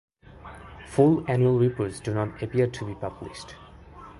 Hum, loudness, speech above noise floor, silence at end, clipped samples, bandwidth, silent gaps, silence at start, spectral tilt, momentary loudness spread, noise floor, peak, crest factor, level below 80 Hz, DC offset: none; -25 LUFS; 22 dB; 0 s; under 0.1%; 11.5 kHz; none; 0.45 s; -8 dB/octave; 23 LU; -46 dBFS; -6 dBFS; 20 dB; -52 dBFS; under 0.1%